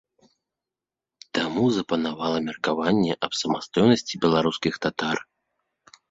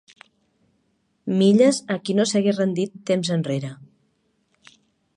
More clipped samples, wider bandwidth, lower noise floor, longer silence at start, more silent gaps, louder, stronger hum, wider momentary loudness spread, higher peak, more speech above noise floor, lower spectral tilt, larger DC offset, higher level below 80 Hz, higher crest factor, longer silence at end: neither; second, 7.8 kHz vs 11 kHz; first, -89 dBFS vs -68 dBFS; about the same, 1.35 s vs 1.25 s; neither; second, -24 LUFS vs -21 LUFS; neither; second, 7 LU vs 11 LU; about the same, -4 dBFS vs -4 dBFS; first, 66 dB vs 48 dB; about the same, -5 dB/octave vs -5.5 dB/octave; neither; first, -60 dBFS vs -70 dBFS; about the same, 22 dB vs 18 dB; second, 0.9 s vs 1.3 s